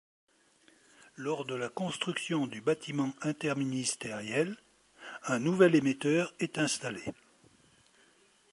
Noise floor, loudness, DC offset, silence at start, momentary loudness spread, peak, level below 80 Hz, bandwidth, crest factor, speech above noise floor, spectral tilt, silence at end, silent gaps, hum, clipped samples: -65 dBFS; -32 LUFS; under 0.1%; 1.2 s; 16 LU; -10 dBFS; -74 dBFS; 11.5 kHz; 22 dB; 34 dB; -4.5 dB/octave; 1.4 s; none; none; under 0.1%